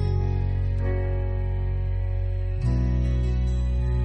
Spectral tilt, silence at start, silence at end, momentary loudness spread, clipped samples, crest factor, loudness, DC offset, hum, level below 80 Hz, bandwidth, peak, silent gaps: -9 dB/octave; 0 s; 0 s; 3 LU; under 0.1%; 10 dB; -26 LUFS; under 0.1%; none; -26 dBFS; 6.2 kHz; -14 dBFS; none